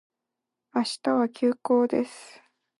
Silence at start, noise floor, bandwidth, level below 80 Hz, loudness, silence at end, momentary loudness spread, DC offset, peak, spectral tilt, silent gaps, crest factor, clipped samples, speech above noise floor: 0.75 s; -86 dBFS; 11.5 kHz; -78 dBFS; -26 LUFS; 0.55 s; 10 LU; under 0.1%; -12 dBFS; -4.5 dB/octave; none; 16 dB; under 0.1%; 60 dB